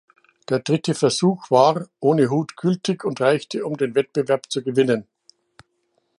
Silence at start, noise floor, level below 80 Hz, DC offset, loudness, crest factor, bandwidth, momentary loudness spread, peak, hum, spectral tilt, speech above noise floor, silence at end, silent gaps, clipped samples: 0.5 s; -69 dBFS; -68 dBFS; under 0.1%; -21 LUFS; 20 dB; 11.5 kHz; 7 LU; -2 dBFS; none; -5.5 dB/octave; 49 dB; 1.15 s; none; under 0.1%